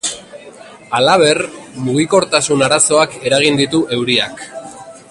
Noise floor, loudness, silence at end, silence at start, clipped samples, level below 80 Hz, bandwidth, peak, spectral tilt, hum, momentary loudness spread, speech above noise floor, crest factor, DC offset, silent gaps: -37 dBFS; -13 LUFS; 0.15 s; 0.05 s; under 0.1%; -54 dBFS; 11.5 kHz; 0 dBFS; -3 dB/octave; none; 18 LU; 23 dB; 16 dB; under 0.1%; none